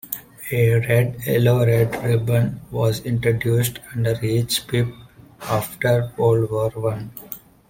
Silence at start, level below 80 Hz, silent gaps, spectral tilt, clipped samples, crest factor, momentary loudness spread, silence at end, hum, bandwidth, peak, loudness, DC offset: 0.05 s; -48 dBFS; none; -6 dB/octave; under 0.1%; 16 dB; 10 LU; 0.3 s; none; 17 kHz; -4 dBFS; -21 LUFS; under 0.1%